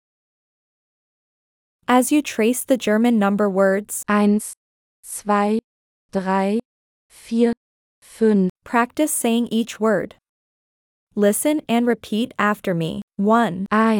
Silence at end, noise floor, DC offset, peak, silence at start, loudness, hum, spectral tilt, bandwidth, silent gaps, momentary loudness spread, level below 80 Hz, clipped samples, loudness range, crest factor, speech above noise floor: 0 s; under -90 dBFS; under 0.1%; -4 dBFS; 1.9 s; -20 LUFS; none; -5 dB/octave; 18.5 kHz; 4.57-5.03 s, 5.64-6.09 s, 6.65-7.09 s, 7.57-8.02 s, 8.50-8.56 s, 10.29-11.07 s, 13.03-13.08 s; 9 LU; -62 dBFS; under 0.1%; 4 LU; 18 dB; over 71 dB